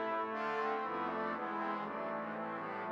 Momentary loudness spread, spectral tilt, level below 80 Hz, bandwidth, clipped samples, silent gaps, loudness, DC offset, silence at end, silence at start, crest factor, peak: 4 LU; -6.5 dB/octave; -82 dBFS; 8.2 kHz; under 0.1%; none; -38 LUFS; under 0.1%; 0 s; 0 s; 12 dB; -26 dBFS